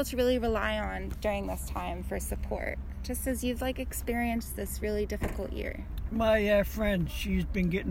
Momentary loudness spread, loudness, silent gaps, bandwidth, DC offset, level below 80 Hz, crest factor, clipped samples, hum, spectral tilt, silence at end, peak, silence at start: 9 LU; -31 LUFS; none; 17 kHz; under 0.1%; -38 dBFS; 16 dB; under 0.1%; none; -5.5 dB/octave; 0 s; -14 dBFS; 0 s